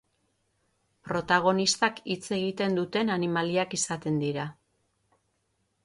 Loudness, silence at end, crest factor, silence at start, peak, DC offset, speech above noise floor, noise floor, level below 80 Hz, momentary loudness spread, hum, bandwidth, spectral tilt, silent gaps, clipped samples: -27 LUFS; 1.3 s; 20 dB; 1.05 s; -10 dBFS; under 0.1%; 47 dB; -75 dBFS; -68 dBFS; 9 LU; none; 11.5 kHz; -4 dB/octave; none; under 0.1%